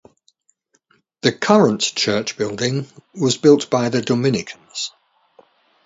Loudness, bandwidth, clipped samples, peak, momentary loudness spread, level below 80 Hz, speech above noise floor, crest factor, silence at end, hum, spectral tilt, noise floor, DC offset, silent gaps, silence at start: -18 LUFS; 8 kHz; under 0.1%; 0 dBFS; 13 LU; -60 dBFS; 46 dB; 20 dB; 0.95 s; none; -4.5 dB/octave; -64 dBFS; under 0.1%; none; 1.25 s